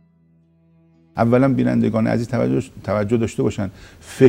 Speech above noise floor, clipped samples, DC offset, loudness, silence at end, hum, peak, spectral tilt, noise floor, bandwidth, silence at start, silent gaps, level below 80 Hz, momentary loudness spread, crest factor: 38 dB; under 0.1%; under 0.1%; -19 LUFS; 0 s; none; 0 dBFS; -8 dB/octave; -56 dBFS; 15 kHz; 1.15 s; none; -48 dBFS; 12 LU; 20 dB